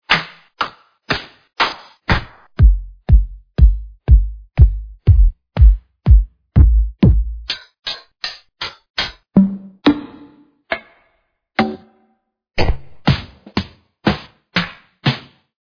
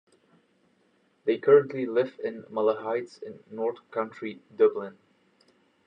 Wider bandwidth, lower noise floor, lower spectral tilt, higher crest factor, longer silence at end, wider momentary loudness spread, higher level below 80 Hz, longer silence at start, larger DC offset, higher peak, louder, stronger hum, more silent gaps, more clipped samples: second, 5.4 kHz vs 6 kHz; about the same, -65 dBFS vs -67 dBFS; about the same, -7 dB/octave vs -7.5 dB/octave; about the same, 16 dB vs 20 dB; second, 0.4 s vs 0.95 s; second, 12 LU vs 18 LU; first, -18 dBFS vs -86 dBFS; second, 0.1 s vs 1.25 s; neither; first, 0 dBFS vs -8 dBFS; first, -18 LUFS vs -27 LUFS; neither; first, 8.90-8.94 s vs none; neither